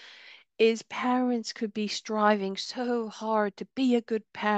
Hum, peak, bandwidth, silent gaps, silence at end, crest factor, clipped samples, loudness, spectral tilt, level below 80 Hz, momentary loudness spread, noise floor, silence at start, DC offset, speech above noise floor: none; -8 dBFS; 8.6 kHz; none; 0 s; 20 dB; under 0.1%; -28 LUFS; -4.5 dB/octave; -80 dBFS; 7 LU; -52 dBFS; 0 s; under 0.1%; 24 dB